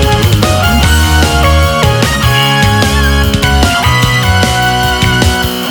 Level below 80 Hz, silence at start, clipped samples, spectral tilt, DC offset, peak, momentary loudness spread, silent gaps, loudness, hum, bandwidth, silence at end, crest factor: -16 dBFS; 0 s; 0.2%; -4.5 dB/octave; under 0.1%; 0 dBFS; 2 LU; none; -9 LUFS; none; over 20 kHz; 0 s; 8 dB